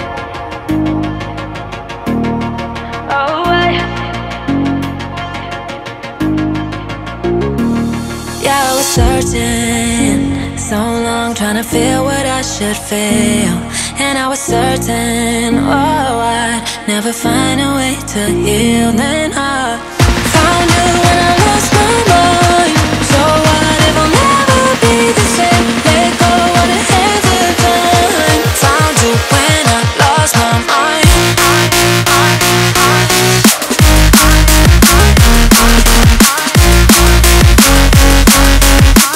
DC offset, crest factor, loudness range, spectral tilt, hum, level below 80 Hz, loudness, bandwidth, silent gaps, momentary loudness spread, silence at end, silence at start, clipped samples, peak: under 0.1%; 10 dB; 9 LU; -4 dB/octave; none; -16 dBFS; -10 LUFS; 16.5 kHz; none; 12 LU; 0 s; 0 s; 0.4%; 0 dBFS